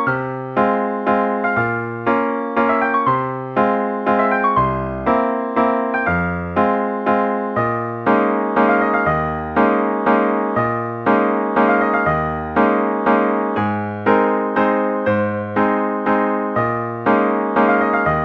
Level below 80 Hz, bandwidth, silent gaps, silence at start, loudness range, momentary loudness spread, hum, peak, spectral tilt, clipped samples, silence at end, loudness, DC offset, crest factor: -44 dBFS; 6 kHz; none; 0 s; 1 LU; 5 LU; none; -2 dBFS; -9 dB/octave; under 0.1%; 0 s; -18 LUFS; under 0.1%; 16 dB